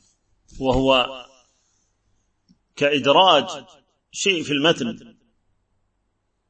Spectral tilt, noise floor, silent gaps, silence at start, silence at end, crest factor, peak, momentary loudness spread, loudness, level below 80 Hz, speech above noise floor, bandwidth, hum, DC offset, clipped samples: -3.5 dB/octave; -71 dBFS; none; 0.55 s; 1.5 s; 22 dB; -2 dBFS; 21 LU; -19 LUFS; -46 dBFS; 52 dB; 8.8 kHz; none; under 0.1%; under 0.1%